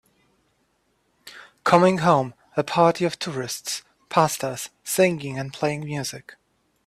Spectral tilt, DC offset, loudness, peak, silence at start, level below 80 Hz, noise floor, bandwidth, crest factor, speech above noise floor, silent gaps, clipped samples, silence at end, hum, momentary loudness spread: -4.5 dB/octave; under 0.1%; -23 LUFS; -4 dBFS; 1.25 s; -62 dBFS; -68 dBFS; 15.5 kHz; 20 dB; 46 dB; none; under 0.1%; 0.65 s; none; 15 LU